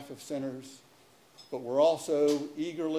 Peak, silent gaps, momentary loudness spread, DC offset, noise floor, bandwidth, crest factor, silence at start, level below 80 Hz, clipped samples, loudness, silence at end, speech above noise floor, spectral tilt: -14 dBFS; none; 16 LU; under 0.1%; -61 dBFS; 16 kHz; 18 dB; 0 s; -76 dBFS; under 0.1%; -30 LUFS; 0 s; 30 dB; -5 dB/octave